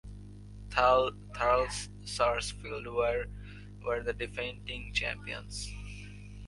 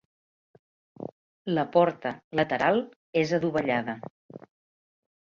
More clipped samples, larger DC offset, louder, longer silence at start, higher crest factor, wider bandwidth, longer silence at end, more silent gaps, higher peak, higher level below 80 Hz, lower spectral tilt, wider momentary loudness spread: neither; neither; second, -32 LUFS vs -27 LUFS; second, 0.05 s vs 1 s; about the same, 24 dB vs 22 dB; first, 11.5 kHz vs 7.2 kHz; second, 0 s vs 0.85 s; second, none vs 1.12-1.45 s, 2.24-2.31 s, 2.96-3.13 s, 4.10-4.29 s; about the same, -10 dBFS vs -8 dBFS; first, -46 dBFS vs -68 dBFS; second, -3.5 dB/octave vs -6.5 dB/octave; about the same, 19 LU vs 19 LU